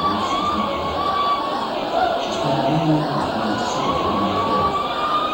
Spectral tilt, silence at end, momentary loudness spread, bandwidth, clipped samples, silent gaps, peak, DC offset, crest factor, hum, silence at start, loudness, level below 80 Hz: -5.5 dB/octave; 0 s; 3 LU; over 20 kHz; under 0.1%; none; -6 dBFS; under 0.1%; 14 dB; none; 0 s; -20 LUFS; -46 dBFS